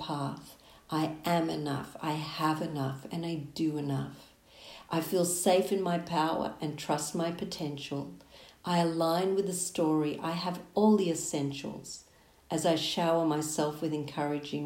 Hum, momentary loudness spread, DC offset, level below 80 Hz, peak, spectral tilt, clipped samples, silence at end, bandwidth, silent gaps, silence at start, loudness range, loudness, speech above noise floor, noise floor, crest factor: none; 11 LU; under 0.1%; -66 dBFS; -14 dBFS; -5 dB/octave; under 0.1%; 0 s; 16 kHz; none; 0 s; 4 LU; -31 LUFS; 21 dB; -52 dBFS; 18 dB